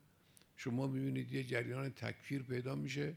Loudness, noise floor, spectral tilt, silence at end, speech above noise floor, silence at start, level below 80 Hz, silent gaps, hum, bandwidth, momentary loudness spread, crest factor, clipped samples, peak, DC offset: -41 LUFS; -68 dBFS; -6.5 dB/octave; 0 s; 28 dB; 0.6 s; -76 dBFS; none; none; 15.5 kHz; 5 LU; 18 dB; under 0.1%; -22 dBFS; under 0.1%